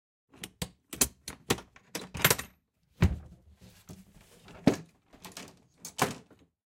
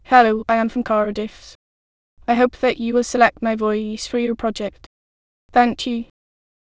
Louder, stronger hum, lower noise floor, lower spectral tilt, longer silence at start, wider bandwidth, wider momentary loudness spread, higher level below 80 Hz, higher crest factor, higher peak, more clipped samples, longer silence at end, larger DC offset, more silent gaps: second, -31 LUFS vs -19 LUFS; neither; second, -68 dBFS vs under -90 dBFS; about the same, -3.5 dB/octave vs -4.5 dB/octave; first, 0.4 s vs 0.1 s; first, 16.5 kHz vs 8 kHz; first, 24 LU vs 12 LU; about the same, -48 dBFS vs -50 dBFS; first, 28 dB vs 20 dB; second, -6 dBFS vs 0 dBFS; neither; second, 0.5 s vs 0.7 s; second, under 0.1% vs 0.2%; second, none vs 1.55-2.17 s, 4.86-5.49 s